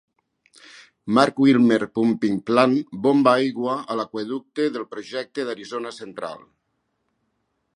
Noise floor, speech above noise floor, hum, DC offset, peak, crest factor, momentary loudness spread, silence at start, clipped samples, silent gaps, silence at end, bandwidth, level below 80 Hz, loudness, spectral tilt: -74 dBFS; 53 dB; none; under 0.1%; 0 dBFS; 22 dB; 16 LU; 1.05 s; under 0.1%; none; 1.4 s; 11 kHz; -68 dBFS; -21 LUFS; -6 dB/octave